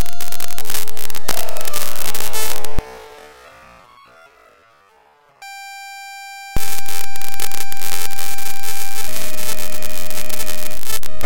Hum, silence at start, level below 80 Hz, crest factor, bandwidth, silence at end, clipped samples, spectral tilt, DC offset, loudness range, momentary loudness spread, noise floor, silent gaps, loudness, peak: none; 0 s; -38 dBFS; 12 dB; 17.5 kHz; 0 s; under 0.1%; -2 dB/octave; under 0.1%; 11 LU; 17 LU; -53 dBFS; none; -26 LUFS; -2 dBFS